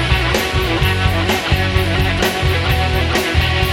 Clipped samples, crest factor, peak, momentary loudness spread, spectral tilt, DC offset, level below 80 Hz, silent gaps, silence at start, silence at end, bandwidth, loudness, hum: under 0.1%; 14 dB; -2 dBFS; 1 LU; -5 dB/octave; under 0.1%; -22 dBFS; none; 0 s; 0 s; 17.5 kHz; -16 LUFS; none